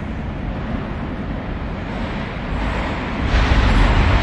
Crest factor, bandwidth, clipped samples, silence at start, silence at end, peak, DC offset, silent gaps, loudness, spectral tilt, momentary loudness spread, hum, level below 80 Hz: 16 dB; 8.4 kHz; under 0.1%; 0 s; 0 s; -4 dBFS; under 0.1%; none; -21 LUFS; -6.5 dB/octave; 11 LU; none; -22 dBFS